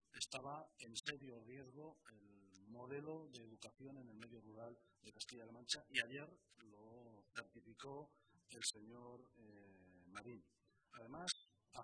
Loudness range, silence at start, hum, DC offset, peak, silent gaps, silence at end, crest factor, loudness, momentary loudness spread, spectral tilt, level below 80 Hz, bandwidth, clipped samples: 7 LU; 0.15 s; none; under 0.1%; -24 dBFS; none; 0 s; 30 dB; -51 LUFS; 20 LU; -2 dB/octave; -86 dBFS; 11 kHz; under 0.1%